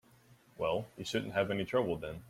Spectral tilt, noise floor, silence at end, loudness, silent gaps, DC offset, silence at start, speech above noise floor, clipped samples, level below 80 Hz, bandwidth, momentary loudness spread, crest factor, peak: -5.5 dB/octave; -63 dBFS; 0 s; -35 LUFS; none; under 0.1%; 0.6 s; 29 dB; under 0.1%; -64 dBFS; 16 kHz; 5 LU; 18 dB; -18 dBFS